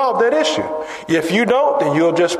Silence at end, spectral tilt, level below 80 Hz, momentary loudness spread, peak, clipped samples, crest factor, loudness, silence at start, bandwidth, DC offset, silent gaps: 0 s; -4.5 dB/octave; -58 dBFS; 7 LU; -2 dBFS; under 0.1%; 12 dB; -16 LUFS; 0 s; 13.5 kHz; under 0.1%; none